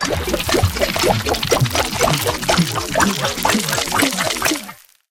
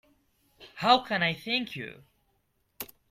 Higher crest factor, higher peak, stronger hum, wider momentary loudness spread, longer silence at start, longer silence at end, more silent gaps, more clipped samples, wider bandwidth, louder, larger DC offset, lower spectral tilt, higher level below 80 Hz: second, 18 dB vs 24 dB; first, 0 dBFS vs -6 dBFS; neither; second, 3 LU vs 19 LU; second, 0 s vs 0.6 s; about the same, 0.35 s vs 0.25 s; neither; neither; about the same, 17 kHz vs 16.5 kHz; first, -17 LUFS vs -27 LUFS; first, 0.1% vs under 0.1%; about the same, -3.5 dB/octave vs -4.5 dB/octave; first, -34 dBFS vs -68 dBFS